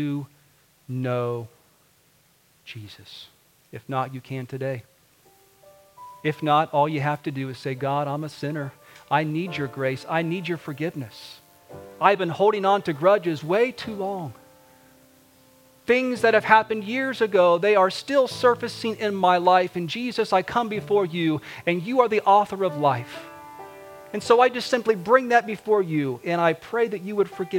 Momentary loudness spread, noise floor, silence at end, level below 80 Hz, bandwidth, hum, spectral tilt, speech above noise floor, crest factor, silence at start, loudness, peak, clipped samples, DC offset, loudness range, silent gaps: 20 LU; -61 dBFS; 0 s; -68 dBFS; 17 kHz; none; -6 dB/octave; 38 dB; 22 dB; 0 s; -23 LUFS; 0 dBFS; under 0.1%; under 0.1%; 13 LU; none